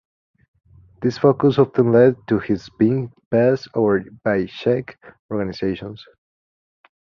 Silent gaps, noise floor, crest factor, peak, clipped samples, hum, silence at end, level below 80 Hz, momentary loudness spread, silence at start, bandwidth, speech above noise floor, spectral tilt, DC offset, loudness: 3.26-3.31 s, 5.19-5.29 s; under -90 dBFS; 18 dB; -2 dBFS; under 0.1%; none; 1 s; -52 dBFS; 11 LU; 1 s; 6.8 kHz; over 71 dB; -8.5 dB/octave; under 0.1%; -19 LUFS